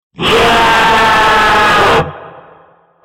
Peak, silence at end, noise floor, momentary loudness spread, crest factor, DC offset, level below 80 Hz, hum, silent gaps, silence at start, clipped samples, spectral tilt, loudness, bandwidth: 0 dBFS; 0.65 s; -45 dBFS; 4 LU; 10 dB; under 0.1%; -32 dBFS; none; none; 0.2 s; under 0.1%; -3.5 dB/octave; -8 LUFS; 17 kHz